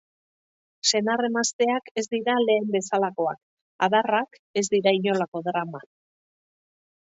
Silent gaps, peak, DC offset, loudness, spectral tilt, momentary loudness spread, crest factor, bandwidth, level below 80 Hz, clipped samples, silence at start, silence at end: 1.53-1.59 s, 1.91-1.95 s, 3.43-3.79 s, 4.39-4.54 s, 5.28-5.32 s; -6 dBFS; under 0.1%; -24 LUFS; -3.5 dB/octave; 8 LU; 18 dB; 8 kHz; -76 dBFS; under 0.1%; 0.85 s; 1.2 s